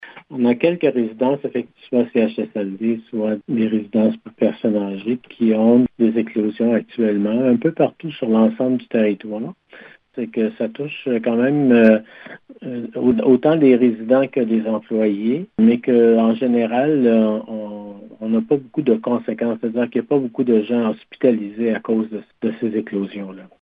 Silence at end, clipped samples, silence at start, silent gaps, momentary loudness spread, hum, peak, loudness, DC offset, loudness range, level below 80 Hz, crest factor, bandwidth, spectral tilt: 0.2 s; under 0.1%; 0 s; none; 13 LU; none; -2 dBFS; -18 LUFS; under 0.1%; 5 LU; -64 dBFS; 16 dB; 3.8 kHz; -10.5 dB/octave